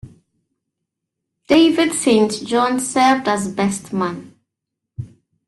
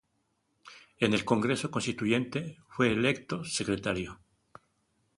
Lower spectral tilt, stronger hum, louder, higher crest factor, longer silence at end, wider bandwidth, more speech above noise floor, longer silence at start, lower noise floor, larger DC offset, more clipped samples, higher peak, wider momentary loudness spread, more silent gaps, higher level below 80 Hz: about the same, -4 dB/octave vs -5 dB/octave; neither; first, -17 LUFS vs -30 LUFS; second, 16 dB vs 22 dB; second, 0.4 s vs 1.05 s; about the same, 12.5 kHz vs 11.5 kHz; first, 65 dB vs 46 dB; second, 0.05 s vs 0.65 s; first, -81 dBFS vs -76 dBFS; neither; neither; first, -2 dBFS vs -10 dBFS; first, 21 LU vs 9 LU; neither; about the same, -56 dBFS vs -60 dBFS